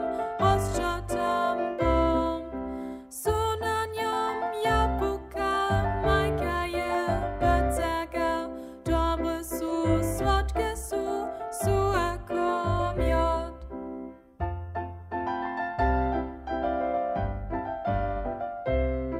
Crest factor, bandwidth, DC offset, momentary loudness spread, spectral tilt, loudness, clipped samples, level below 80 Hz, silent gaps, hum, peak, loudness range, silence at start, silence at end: 18 dB; 16 kHz; under 0.1%; 10 LU; -6 dB/octave; -28 LUFS; under 0.1%; -36 dBFS; none; none; -10 dBFS; 3 LU; 0 s; 0 s